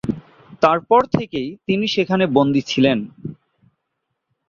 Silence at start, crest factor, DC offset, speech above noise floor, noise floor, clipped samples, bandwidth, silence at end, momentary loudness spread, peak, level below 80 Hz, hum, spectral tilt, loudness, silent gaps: 0.05 s; 18 dB; under 0.1%; 58 dB; -76 dBFS; under 0.1%; 7.2 kHz; 1.15 s; 15 LU; -2 dBFS; -52 dBFS; none; -6.5 dB/octave; -18 LUFS; none